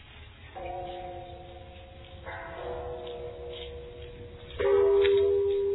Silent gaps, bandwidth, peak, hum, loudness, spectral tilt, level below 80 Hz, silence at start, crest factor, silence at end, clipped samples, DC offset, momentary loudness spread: none; 4.1 kHz; -12 dBFS; none; -29 LUFS; -9.5 dB/octave; -50 dBFS; 0 s; 18 dB; 0 s; under 0.1%; under 0.1%; 24 LU